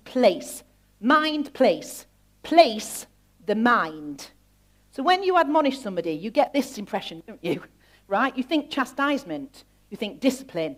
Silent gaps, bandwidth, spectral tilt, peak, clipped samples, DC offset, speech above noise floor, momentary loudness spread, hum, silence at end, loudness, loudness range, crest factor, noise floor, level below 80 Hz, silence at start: none; 16 kHz; -4 dB/octave; -4 dBFS; under 0.1%; under 0.1%; 36 dB; 18 LU; 50 Hz at -60 dBFS; 0.05 s; -24 LUFS; 5 LU; 22 dB; -60 dBFS; -62 dBFS; 0.05 s